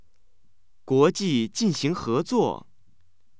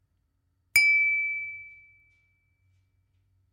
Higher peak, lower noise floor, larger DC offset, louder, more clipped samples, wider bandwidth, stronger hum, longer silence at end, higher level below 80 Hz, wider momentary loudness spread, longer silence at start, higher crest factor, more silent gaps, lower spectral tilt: about the same, -8 dBFS vs -8 dBFS; second, -69 dBFS vs -73 dBFS; first, 0.4% vs under 0.1%; about the same, -24 LUFS vs -22 LUFS; neither; second, 8 kHz vs 16 kHz; neither; second, 0.85 s vs 1.85 s; first, -60 dBFS vs -68 dBFS; second, 6 LU vs 18 LU; about the same, 0.85 s vs 0.75 s; about the same, 18 dB vs 22 dB; neither; first, -5.5 dB/octave vs 2.5 dB/octave